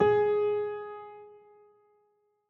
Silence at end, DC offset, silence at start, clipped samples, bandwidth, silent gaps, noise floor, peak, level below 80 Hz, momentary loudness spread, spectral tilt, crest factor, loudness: 1.2 s; under 0.1%; 0 s; under 0.1%; 4.1 kHz; none; -72 dBFS; -12 dBFS; -68 dBFS; 23 LU; -5 dB/octave; 18 dB; -28 LUFS